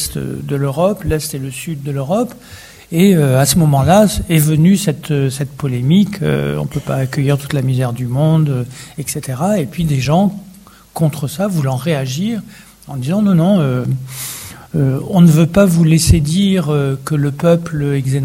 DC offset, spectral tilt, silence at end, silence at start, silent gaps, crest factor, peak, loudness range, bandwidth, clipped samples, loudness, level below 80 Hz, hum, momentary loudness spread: under 0.1%; -6.5 dB/octave; 0 s; 0 s; none; 14 dB; 0 dBFS; 5 LU; 16.5 kHz; under 0.1%; -15 LUFS; -34 dBFS; none; 12 LU